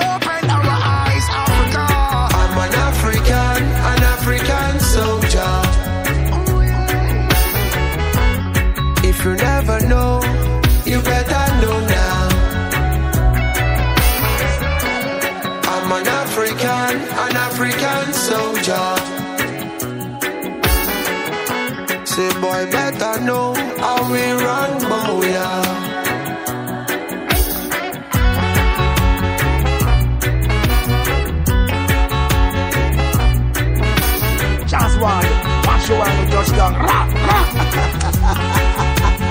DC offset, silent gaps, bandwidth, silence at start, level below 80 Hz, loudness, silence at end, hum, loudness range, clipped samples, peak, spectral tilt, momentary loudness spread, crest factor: under 0.1%; none; 16.5 kHz; 0 s; -20 dBFS; -16 LUFS; 0 s; none; 3 LU; under 0.1%; -2 dBFS; -4.5 dB/octave; 5 LU; 14 dB